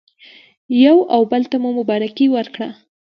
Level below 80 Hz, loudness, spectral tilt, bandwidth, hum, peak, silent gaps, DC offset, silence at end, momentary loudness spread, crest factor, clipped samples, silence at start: -70 dBFS; -15 LUFS; -7.5 dB/octave; 5.8 kHz; none; -2 dBFS; none; under 0.1%; 0.45 s; 14 LU; 16 dB; under 0.1%; 0.7 s